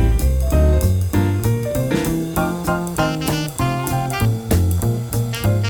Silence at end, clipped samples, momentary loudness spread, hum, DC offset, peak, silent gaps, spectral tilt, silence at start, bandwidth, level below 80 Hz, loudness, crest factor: 0 s; under 0.1%; 5 LU; none; under 0.1%; -2 dBFS; none; -6 dB/octave; 0 s; over 20 kHz; -24 dBFS; -19 LUFS; 16 dB